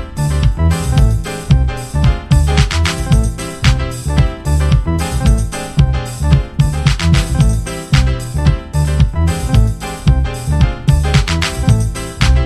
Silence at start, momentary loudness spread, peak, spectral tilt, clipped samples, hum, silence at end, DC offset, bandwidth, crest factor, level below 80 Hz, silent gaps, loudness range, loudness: 0 s; 4 LU; 0 dBFS; -5.5 dB/octave; under 0.1%; none; 0 s; under 0.1%; 14 kHz; 12 dB; -16 dBFS; none; 1 LU; -15 LUFS